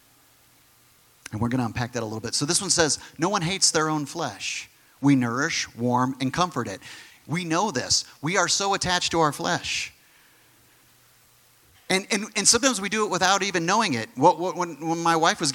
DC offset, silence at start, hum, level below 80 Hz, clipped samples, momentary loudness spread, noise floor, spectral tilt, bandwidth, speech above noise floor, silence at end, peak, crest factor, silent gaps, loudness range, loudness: under 0.1%; 1.3 s; none; -58 dBFS; under 0.1%; 10 LU; -58 dBFS; -3 dB/octave; 18 kHz; 34 dB; 0 s; -4 dBFS; 22 dB; none; 4 LU; -23 LUFS